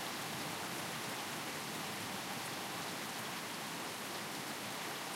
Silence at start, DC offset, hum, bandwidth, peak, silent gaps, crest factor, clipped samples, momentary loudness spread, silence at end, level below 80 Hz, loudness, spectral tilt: 0 s; under 0.1%; none; 16 kHz; -28 dBFS; none; 14 dB; under 0.1%; 1 LU; 0 s; -78 dBFS; -41 LUFS; -2.5 dB/octave